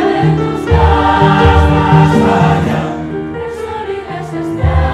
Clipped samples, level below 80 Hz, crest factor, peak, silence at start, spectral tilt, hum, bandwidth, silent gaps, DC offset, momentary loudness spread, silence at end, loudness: under 0.1%; -20 dBFS; 10 dB; 0 dBFS; 0 s; -7.5 dB/octave; none; 11 kHz; none; under 0.1%; 13 LU; 0 s; -12 LUFS